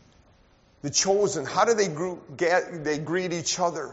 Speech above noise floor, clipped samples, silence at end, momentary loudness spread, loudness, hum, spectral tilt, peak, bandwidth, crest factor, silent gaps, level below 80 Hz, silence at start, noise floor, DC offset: 34 dB; under 0.1%; 0 s; 8 LU; -25 LUFS; none; -3 dB/octave; -8 dBFS; 8 kHz; 18 dB; none; -62 dBFS; 0.85 s; -59 dBFS; under 0.1%